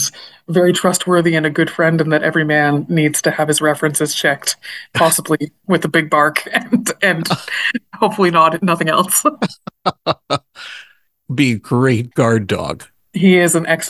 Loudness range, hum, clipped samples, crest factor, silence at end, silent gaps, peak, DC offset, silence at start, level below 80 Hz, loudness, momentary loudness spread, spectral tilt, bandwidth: 3 LU; none; under 0.1%; 16 dB; 0 s; none; 0 dBFS; under 0.1%; 0 s; -52 dBFS; -15 LUFS; 10 LU; -4 dB/octave; 13 kHz